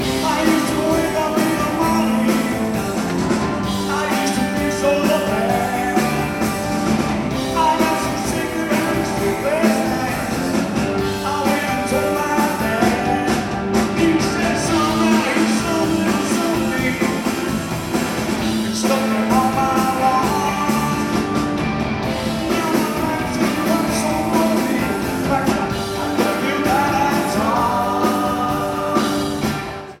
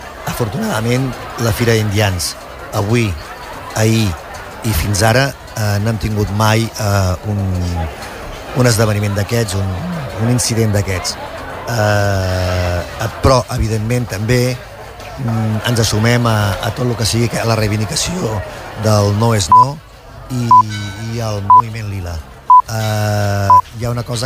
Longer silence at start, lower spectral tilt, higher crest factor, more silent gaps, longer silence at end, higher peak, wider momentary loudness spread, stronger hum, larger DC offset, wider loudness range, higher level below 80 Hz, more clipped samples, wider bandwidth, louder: about the same, 0 s vs 0 s; about the same, -5 dB/octave vs -5 dB/octave; about the same, 16 dB vs 14 dB; neither; about the same, 0.05 s vs 0 s; about the same, -2 dBFS vs 0 dBFS; second, 4 LU vs 14 LU; neither; neither; about the same, 2 LU vs 4 LU; second, -40 dBFS vs -32 dBFS; neither; about the same, 17.5 kHz vs 16 kHz; second, -19 LUFS vs -15 LUFS